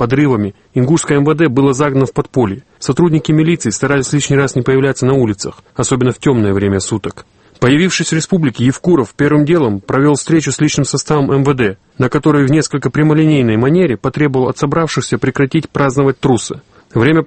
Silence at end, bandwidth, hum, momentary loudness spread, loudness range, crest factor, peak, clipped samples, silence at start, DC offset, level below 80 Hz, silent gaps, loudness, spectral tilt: 0 s; 8.8 kHz; none; 6 LU; 2 LU; 12 dB; 0 dBFS; under 0.1%; 0 s; under 0.1%; -42 dBFS; none; -13 LUFS; -6 dB/octave